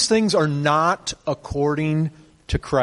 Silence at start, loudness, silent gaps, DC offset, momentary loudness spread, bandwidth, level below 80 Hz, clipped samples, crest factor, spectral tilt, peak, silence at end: 0 s; -21 LUFS; none; under 0.1%; 10 LU; 11.5 kHz; -40 dBFS; under 0.1%; 16 dB; -5 dB/octave; -4 dBFS; 0 s